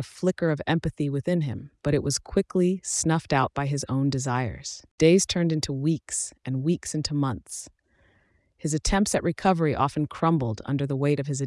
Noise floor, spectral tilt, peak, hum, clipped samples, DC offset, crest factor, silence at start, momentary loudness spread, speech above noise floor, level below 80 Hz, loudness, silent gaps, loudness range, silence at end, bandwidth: -65 dBFS; -5 dB/octave; -6 dBFS; none; under 0.1%; under 0.1%; 18 dB; 0 s; 7 LU; 40 dB; -46 dBFS; -25 LUFS; 4.91-4.98 s; 4 LU; 0 s; 12 kHz